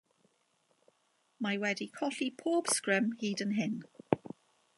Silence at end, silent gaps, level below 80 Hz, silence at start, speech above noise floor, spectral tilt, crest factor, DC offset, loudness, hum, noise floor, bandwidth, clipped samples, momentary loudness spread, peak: 0.6 s; none; -76 dBFS; 1.4 s; 41 dB; -3.5 dB/octave; 28 dB; under 0.1%; -34 LUFS; none; -75 dBFS; 11.5 kHz; under 0.1%; 9 LU; -8 dBFS